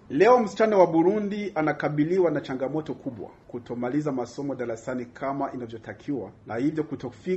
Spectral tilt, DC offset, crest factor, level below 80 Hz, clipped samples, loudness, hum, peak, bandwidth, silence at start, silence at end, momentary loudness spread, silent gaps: -7 dB/octave; under 0.1%; 20 dB; -62 dBFS; under 0.1%; -26 LUFS; none; -4 dBFS; 8.2 kHz; 0.1 s; 0 s; 17 LU; none